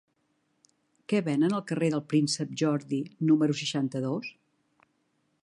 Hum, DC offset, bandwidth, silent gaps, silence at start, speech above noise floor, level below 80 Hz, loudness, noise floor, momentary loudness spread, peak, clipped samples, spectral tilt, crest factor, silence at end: none; under 0.1%; 11.5 kHz; none; 1.1 s; 47 dB; -78 dBFS; -28 LUFS; -74 dBFS; 9 LU; -14 dBFS; under 0.1%; -5.5 dB/octave; 16 dB; 1.1 s